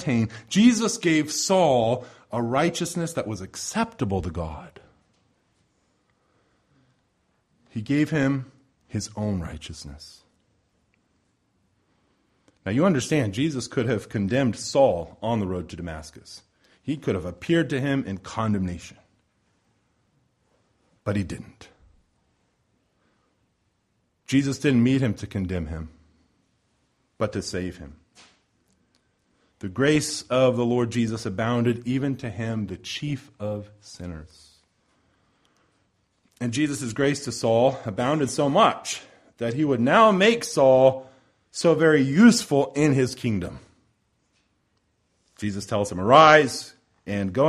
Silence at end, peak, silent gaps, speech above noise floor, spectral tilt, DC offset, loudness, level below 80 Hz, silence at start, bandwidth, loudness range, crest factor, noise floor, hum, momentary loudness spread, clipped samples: 0 s; -2 dBFS; none; 48 dB; -5.5 dB/octave; under 0.1%; -23 LUFS; -52 dBFS; 0 s; 14 kHz; 16 LU; 22 dB; -71 dBFS; none; 18 LU; under 0.1%